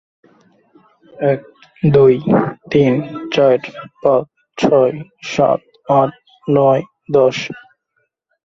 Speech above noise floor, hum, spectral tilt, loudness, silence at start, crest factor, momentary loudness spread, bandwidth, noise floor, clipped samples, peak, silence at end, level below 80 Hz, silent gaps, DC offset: 54 dB; none; -7 dB/octave; -15 LUFS; 1.2 s; 16 dB; 12 LU; 7.6 kHz; -68 dBFS; under 0.1%; 0 dBFS; 0.85 s; -54 dBFS; none; under 0.1%